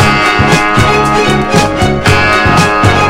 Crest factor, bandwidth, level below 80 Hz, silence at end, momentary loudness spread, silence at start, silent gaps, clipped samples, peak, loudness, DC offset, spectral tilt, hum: 8 dB; 16.5 kHz; -26 dBFS; 0 s; 3 LU; 0 s; none; 0.6%; 0 dBFS; -8 LUFS; under 0.1%; -5 dB/octave; none